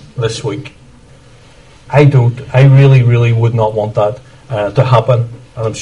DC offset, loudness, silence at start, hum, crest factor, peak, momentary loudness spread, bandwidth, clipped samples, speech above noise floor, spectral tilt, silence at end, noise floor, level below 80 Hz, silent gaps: under 0.1%; -11 LUFS; 0.15 s; none; 12 dB; 0 dBFS; 15 LU; 10 kHz; 0.2%; 30 dB; -7.5 dB/octave; 0 s; -40 dBFS; -42 dBFS; none